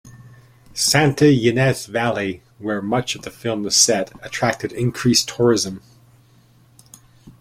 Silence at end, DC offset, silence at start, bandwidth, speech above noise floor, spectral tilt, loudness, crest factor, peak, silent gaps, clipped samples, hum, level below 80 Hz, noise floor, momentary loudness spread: 0.1 s; under 0.1%; 0.05 s; 16.5 kHz; 34 dB; -4 dB/octave; -18 LUFS; 20 dB; 0 dBFS; none; under 0.1%; none; -52 dBFS; -53 dBFS; 13 LU